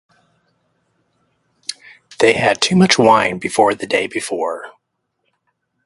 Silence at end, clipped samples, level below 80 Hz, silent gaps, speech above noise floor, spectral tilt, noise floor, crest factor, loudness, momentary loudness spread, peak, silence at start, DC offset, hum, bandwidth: 1.15 s; under 0.1%; -56 dBFS; none; 57 dB; -4 dB/octave; -72 dBFS; 18 dB; -15 LUFS; 18 LU; 0 dBFS; 1.7 s; under 0.1%; none; 11.5 kHz